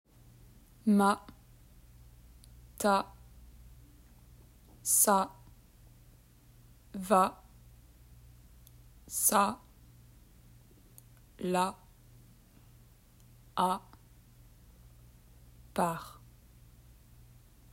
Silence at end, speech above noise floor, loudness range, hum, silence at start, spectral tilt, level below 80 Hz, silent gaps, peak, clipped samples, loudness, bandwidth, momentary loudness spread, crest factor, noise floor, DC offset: 1.6 s; 31 dB; 9 LU; none; 0.85 s; -4 dB/octave; -60 dBFS; none; -12 dBFS; under 0.1%; -30 LUFS; 16 kHz; 17 LU; 24 dB; -59 dBFS; under 0.1%